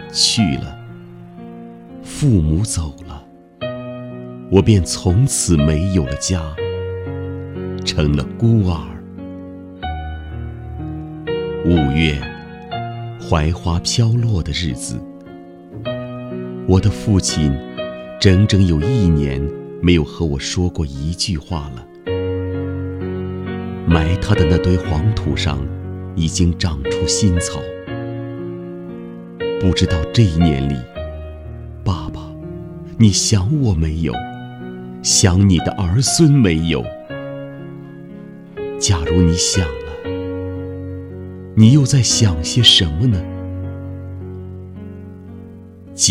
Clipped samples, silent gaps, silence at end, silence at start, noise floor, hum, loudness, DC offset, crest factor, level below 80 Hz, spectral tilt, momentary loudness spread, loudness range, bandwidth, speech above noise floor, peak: under 0.1%; none; 0 s; 0 s; -37 dBFS; none; -17 LUFS; under 0.1%; 18 dB; -30 dBFS; -5 dB/octave; 19 LU; 6 LU; 14.5 kHz; 22 dB; 0 dBFS